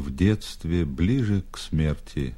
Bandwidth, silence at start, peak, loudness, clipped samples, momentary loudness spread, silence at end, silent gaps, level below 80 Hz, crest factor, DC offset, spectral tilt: 13 kHz; 0 s; -8 dBFS; -26 LUFS; under 0.1%; 5 LU; 0 s; none; -36 dBFS; 16 dB; under 0.1%; -7 dB/octave